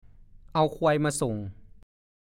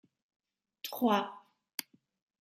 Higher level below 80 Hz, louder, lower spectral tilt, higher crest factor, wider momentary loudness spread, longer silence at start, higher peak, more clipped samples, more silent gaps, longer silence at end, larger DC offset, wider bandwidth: first, -52 dBFS vs -84 dBFS; first, -27 LUFS vs -34 LUFS; first, -5.5 dB/octave vs -4 dB/octave; second, 18 dB vs 24 dB; second, 11 LU vs 14 LU; second, 0.55 s vs 0.85 s; first, -10 dBFS vs -14 dBFS; neither; second, none vs 1.74-1.78 s; about the same, 0.6 s vs 0.6 s; neither; about the same, 16 kHz vs 16 kHz